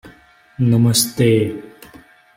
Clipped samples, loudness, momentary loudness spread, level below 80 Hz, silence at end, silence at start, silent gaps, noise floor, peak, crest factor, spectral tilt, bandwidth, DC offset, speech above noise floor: under 0.1%; -16 LUFS; 10 LU; -50 dBFS; 0.65 s; 0.05 s; none; -48 dBFS; -2 dBFS; 16 dB; -5 dB/octave; 16.5 kHz; under 0.1%; 33 dB